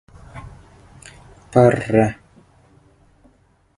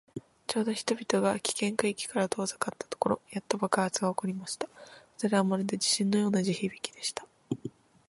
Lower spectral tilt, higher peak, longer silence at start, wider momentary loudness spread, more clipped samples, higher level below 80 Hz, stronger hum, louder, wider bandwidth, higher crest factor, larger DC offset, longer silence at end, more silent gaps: first, -8 dB/octave vs -4 dB/octave; first, 0 dBFS vs -10 dBFS; first, 0.35 s vs 0.15 s; first, 25 LU vs 11 LU; neither; first, -48 dBFS vs -70 dBFS; neither; first, -17 LUFS vs -30 LUFS; about the same, 11.5 kHz vs 11.5 kHz; about the same, 22 dB vs 22 dB; neither; first, 1.65 s vs 0.4 s; neither